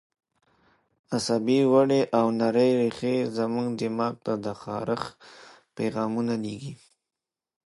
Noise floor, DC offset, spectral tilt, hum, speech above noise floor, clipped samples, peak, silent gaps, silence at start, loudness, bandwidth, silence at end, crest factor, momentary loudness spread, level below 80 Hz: -89 dBFS; under 0.1%; -6 dB/octave; none; 64 dB; under 0.1%; -8 dBFS; none; 1.1 s; -26 LUFS; 11.5 kHz; 0.9 s; 20 dB; 12 LU; -68 dBFS